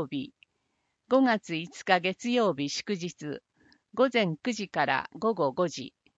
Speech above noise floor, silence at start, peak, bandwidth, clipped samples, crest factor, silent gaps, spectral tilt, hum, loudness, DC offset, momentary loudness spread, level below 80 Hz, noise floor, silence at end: 49 dB; 0 s; -6 dBFS; 8 kHz; under 0.1%; 22 dB; none; -4.5 dB/octave; none; -28 LUFS; under 0.1%; 14 LU; -74 dBFS; -78 dBFS; 0.3 s